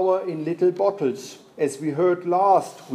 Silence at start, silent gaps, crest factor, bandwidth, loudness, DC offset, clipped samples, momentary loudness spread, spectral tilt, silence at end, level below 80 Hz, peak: 0 s; none; 16 dB; 13 kHz; -22 LUFS; under 0.1%; under 0.1%; 9 LU; -6.5 dB/octave; 0 s; -80 dBFS; -6 dBFS